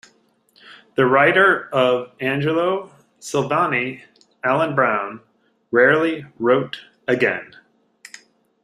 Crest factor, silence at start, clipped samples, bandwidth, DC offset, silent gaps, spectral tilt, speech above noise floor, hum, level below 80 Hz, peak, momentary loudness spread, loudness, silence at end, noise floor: 18 dB; 0.7 s; under 0.1%; 13 kHz; under 0.1%; none; -5.5 dB/octave; 41 dB; none; -64 dBFS; -2 dBFS; 14 LU; -19 LUFS; 1.2 s; -59 dBFS